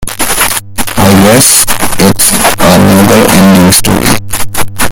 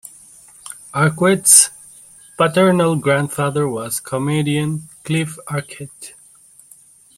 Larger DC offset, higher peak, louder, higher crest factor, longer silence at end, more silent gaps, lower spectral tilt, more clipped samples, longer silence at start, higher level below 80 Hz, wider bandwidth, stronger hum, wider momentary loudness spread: neither; about the same, 0 dBFS vs 0 dBFS; first, -5 LUFS vs -16 LUFS; second, 6 dB vs 18 dB; second, 0 s vs 1.05 s; neither; about the same, -3.5 dB/octave vs -4 dB/octave; first, 9% vs under 0.1%; about the same, 0 s vs 0.05 s; first, -26 dBFS vs -58 dBFS; first, over 20 kHz vs 16.5 kHz; neither; second, 10 LU vs 24 LU